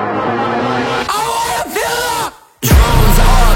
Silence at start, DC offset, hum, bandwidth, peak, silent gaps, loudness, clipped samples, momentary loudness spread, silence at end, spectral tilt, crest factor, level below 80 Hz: 0 s; under 0.1%; none; 17 kHz; 0 dBFS; none; -14 LUFS; under 0.1%; 7 LU; 0 s; -4.5 dB/octave; 12 dB; -14 dBFS